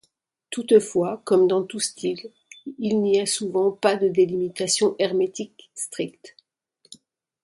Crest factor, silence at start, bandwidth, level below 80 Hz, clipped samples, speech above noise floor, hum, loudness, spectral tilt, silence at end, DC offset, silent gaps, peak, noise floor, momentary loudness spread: 20 dB; 0.5 s; 11.5 kHz; -70 dBFS; under 0.1%; 47 dB; none; -22 LUFS; -4 dB/octave; 1.15 s; under 0.1%; none; -4 dBFS; -69 dBFS; 15 LU